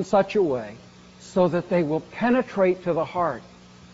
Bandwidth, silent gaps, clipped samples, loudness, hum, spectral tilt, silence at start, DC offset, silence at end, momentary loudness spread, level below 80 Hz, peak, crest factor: 8 kHz; none; under 0.1%; -24 LUFS; none; -6 dB/octave; 0 s; under 0.1%; 0.45 s; 8 LU; -58 dBFS; -6 dBFS; 18 dB